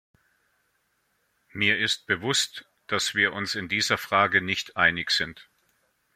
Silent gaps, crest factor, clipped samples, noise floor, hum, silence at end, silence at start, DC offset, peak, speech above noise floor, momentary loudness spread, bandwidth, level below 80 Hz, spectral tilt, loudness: none; 22 dB; under 0.1%; -72 dBFS; none; 0.75 s; 1.55 s; under 0.1%; -4 dBFS; 46 dB; 9 LU; 16.5 kHz; -64 dBFS; -2 dB/octave; -24 LUFS